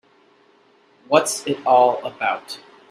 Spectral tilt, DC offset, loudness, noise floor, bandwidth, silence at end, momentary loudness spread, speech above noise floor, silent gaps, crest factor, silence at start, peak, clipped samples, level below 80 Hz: -3 dB/octave; under 0.1%; -19 LUFS; -56 dBFS; 15 kHz; 0.35 s; 16 LU; 37 dB; none; 20 dB; 1.1 s; 0 dBFS; under 0.1%; -72 dBFS